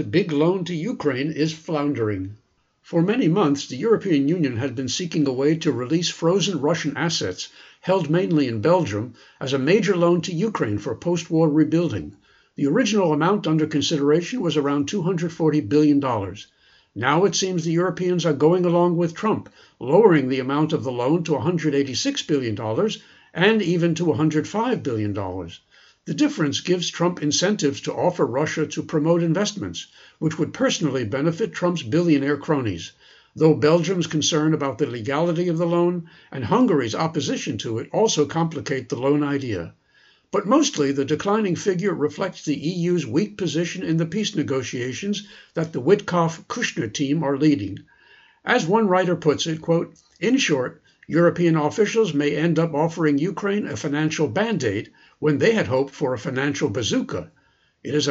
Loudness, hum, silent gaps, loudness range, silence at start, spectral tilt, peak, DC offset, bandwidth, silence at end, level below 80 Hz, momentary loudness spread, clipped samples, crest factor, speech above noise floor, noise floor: -22 LUFS; none; none; 3 LU; 0 s; -5.5 dB/octave; -2 dBFS; under 0.1%; 7.8 kHz; 0 s; -62 dBFS; 9 LU; under 0.1%; 20 dB; 37 dB; -58 dBFS